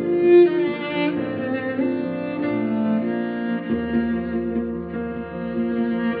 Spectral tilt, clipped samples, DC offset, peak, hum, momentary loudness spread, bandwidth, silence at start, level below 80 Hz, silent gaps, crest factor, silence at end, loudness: -6 dB/octave; under 0.1%; under 0.1%; -6 dBFS; none; 13 LU; 4.7 kHz; 0 s; -52 dBFS; none; 16 dB; 0 s; -22 LUFS